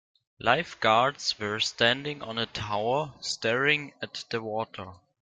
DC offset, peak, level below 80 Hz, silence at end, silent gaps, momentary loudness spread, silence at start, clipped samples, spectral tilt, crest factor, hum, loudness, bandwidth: under 0.1%; -6 dBFS; -62 dBFS; 0.35 s; none; 11 LU; 0.4 s; under 0.1%; -3.5 dB/octave; 24 dB; none; -27 LUFS; 9.6 kHz